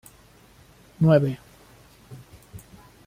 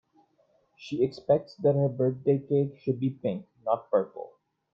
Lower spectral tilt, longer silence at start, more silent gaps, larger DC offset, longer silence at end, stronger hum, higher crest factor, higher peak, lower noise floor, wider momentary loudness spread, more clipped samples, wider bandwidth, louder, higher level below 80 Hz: about the same, -8.5 dB/octave vs -9.5 dB/octave; first, 1 s vs 0.8 s; neither; neither; about the same, 0.5 s vs 0.45 s; neither; about the same, 20 dB vs 18 dB; first, -6 dBFS vs -12 dBFS; second, -53 dBFS vs -68 dBFS; first, 27 LU vs 12 LU; neither; first, 15.5 kHz vs 6.8 kHz; first, -21 LUFS vs -28 LUFS; first, -56 dBFS vs -70 dBFS